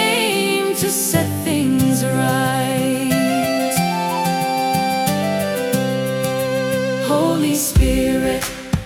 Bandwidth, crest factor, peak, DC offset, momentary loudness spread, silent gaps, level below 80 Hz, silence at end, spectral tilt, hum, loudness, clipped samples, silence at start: 18 kHz; 16 dB; -2 dBFS; under 0.1%; 4 LU; none; -32 dBFS; 0 s; -4.5 dB/octave; none; -18 LUFS; under 0.1%; 0 s